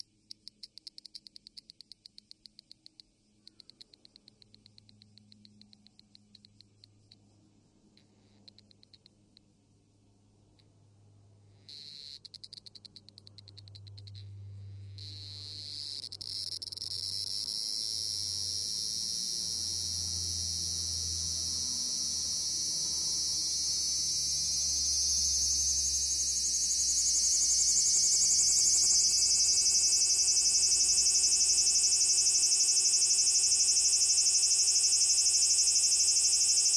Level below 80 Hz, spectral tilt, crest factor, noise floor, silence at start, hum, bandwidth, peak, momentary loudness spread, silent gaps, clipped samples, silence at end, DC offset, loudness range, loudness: -58 dBFS; 1.5 dB/octave; 18 dB; -66 dBFS; 11.7 s; none; 12 kHz; -14 dBFS; 19 LU; none; under 0.1%; 0 s; under 0.1%; 17 LU; -26 LUFS